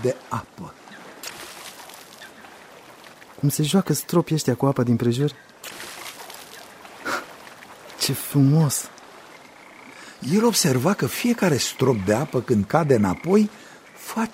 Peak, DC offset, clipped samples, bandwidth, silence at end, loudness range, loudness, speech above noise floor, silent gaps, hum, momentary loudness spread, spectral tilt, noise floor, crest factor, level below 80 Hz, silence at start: -2 dBFS; under 0.1%; under 0.1%; 16 kHz; 0 s; 9 LU; -22 LUFS; 25 dB; none; none; 23 LU; -5 dB/octave; -45 dBFS; 22 dB; -60 dBFS; 0 s